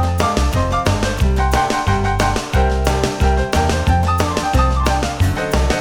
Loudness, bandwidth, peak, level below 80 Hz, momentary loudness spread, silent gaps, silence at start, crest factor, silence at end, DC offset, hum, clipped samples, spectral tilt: -17 LUFS; 18.5 kHz; 0 dBFS; -20 dBFS; 2 LU; none; 0 s; 16 dB; 0 s; 0.2%; none; under 0.1%; -5.5 dB/octave